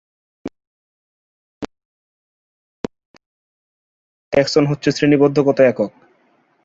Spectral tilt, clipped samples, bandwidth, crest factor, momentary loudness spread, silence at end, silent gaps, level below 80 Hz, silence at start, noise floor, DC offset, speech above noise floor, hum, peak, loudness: -6 dB/octave; under 0.1%; 7.8 kHz; 20 dB; 22 LU; 0.75 s; 0.67-1.61 s, 1.85-2.84 s, 3.05-3.14 s, 3.26-4.32 s; -56 dBFS; 0.45 s; -59 dBFS; under 0.1%; 45 dB; none; -2 dBFS; -16 LUFS